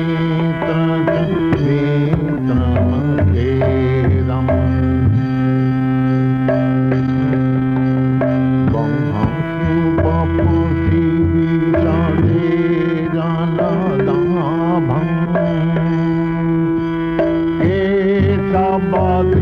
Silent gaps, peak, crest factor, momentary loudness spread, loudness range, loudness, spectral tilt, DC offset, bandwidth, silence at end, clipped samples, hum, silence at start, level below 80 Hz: none; -4 dBFS; 10 dB; 2 LU; 1 LU; -16 LUFS; -10 dB/octave; under 0.1%; 5.2 kHz; 0 s; under 0.1%; none; 0 s; -32 dBFS